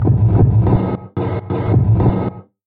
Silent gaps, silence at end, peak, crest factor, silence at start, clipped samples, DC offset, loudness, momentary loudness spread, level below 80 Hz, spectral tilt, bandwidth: none; 0.25 s; -2 dBFS; 12 dB; 0 s; under 0.1%; under 0.1%; -16 LUFS; 9 LU; -28 dBFS; -13.5 dB/octave; 3.9 kHz